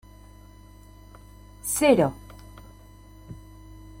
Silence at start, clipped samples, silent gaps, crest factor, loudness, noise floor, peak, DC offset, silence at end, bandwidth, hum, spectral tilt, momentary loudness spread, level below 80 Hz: 1.65 s; under 0.1%; none; 24 dB; -23 LUFS; -48 dBFS; -6 dBFS; under 0.1%; 0.25 s; 16.5 kHz; 50 Hz at -45 dBFS; -4.5 dB/octave; 28 LU; -50 dBFS